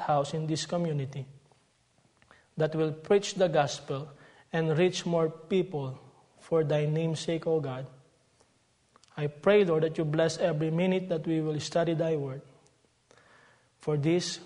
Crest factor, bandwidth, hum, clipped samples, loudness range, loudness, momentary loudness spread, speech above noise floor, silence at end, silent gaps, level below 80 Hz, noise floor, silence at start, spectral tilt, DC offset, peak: 20 dB; 10.5 kHz; none; under 0.1%; 4 LU; -29 LUFS; 13 LU; 40 dB; 0 s; none; -70 dBFS; -68 dBFS; 0 s; -6 dB/octave; under 0.1%; -10 dBFS